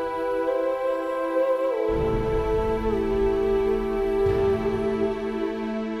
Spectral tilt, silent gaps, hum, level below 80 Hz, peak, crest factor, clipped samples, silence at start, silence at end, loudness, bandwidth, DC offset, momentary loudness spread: -7.5 dB/octave; none; none; -38 dBFS; -12 dBFS; 12 dB; under 0.1%; 0 s; 0 s; -25 LUFS; 14 kHz; under 0.1%; 4 LU